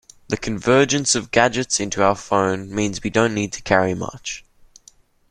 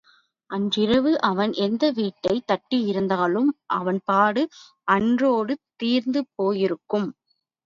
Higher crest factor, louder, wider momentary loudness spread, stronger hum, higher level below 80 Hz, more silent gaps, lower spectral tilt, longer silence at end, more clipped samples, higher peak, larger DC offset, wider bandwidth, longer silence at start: about the same, 20 dB vs 18 dB; first, -19 LUFS vs -23 LUFS; first, 11 LU vs 7 LU; neither; first, -48 dBFS vs -62 dBFS; neither; second, -3.5 dB/octave vs -6.5 dB/octave; first, 0.9 s vs 0.55 s; neither; about the same, -2 dBFS vs -4 dBFS; neither; first, 12.5 kHz vs 7.4 kHz; second, 0.3 s vs 0.5 s